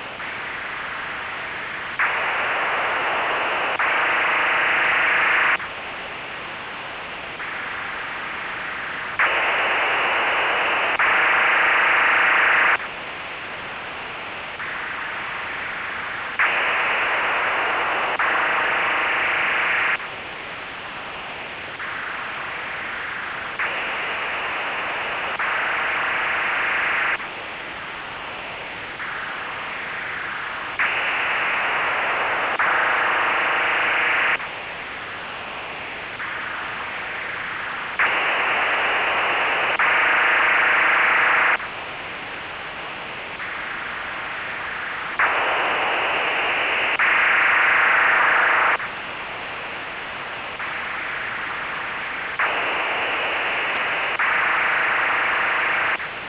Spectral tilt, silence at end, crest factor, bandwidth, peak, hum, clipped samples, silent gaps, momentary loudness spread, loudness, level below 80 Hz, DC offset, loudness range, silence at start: 1 dB/octave; 0 s; 12 dB; 4 kHz; -10 dBFS; none; under 0.1%; none; 14 LU; -21 LUFS; -56 dBFS; under 0.1%; 10 LU; 0 s